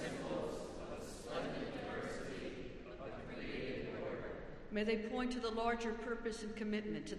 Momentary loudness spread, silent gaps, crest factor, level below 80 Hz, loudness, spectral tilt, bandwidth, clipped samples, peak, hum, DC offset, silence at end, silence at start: 10 LU; none; 18 dB; -58 dBFS; -43 LUFS; -5 dB/octave; 12.5 kHz; under 0.1%; -24 dBFS; none; under 0.1%; 0 s; 0 s